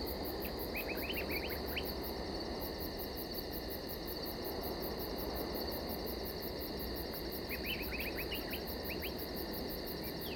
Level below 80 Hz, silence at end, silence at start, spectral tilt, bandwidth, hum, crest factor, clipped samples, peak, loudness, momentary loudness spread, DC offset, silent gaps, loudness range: -50 dBFS; 0 s; 0 s; -4.5 dB/octave; over 20 kHz; none; 14 dB; under 0.1%; -26 dBFS; -40 LUFS; 3 LU; under 0.1%; none; 1 LU